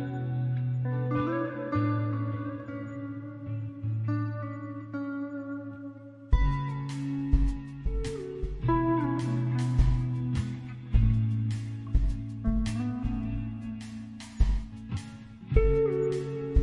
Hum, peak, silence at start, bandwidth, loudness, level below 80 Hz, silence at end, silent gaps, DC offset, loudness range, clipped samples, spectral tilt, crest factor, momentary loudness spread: none; -8 dBFS; 0 s; 11 kHz; -31 LUFS; -34 dBFS; 0 s; none; under 0.1%; 5 LU; under 0.1%; -8.5 dB/octave; 20 dB; 12 LU